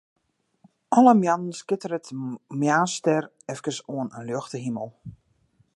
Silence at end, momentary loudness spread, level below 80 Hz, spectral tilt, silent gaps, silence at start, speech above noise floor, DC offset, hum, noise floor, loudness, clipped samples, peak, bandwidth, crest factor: 0.65 s; 16 LU; -68 dBFS; -5.5 dB/octave; none; 0.9 s; 41 dB; under 0.1%; none; -65 dBFS; -24 LUFS; under 0.1%; -4 dBFS; 11.5 kHz; 22 dB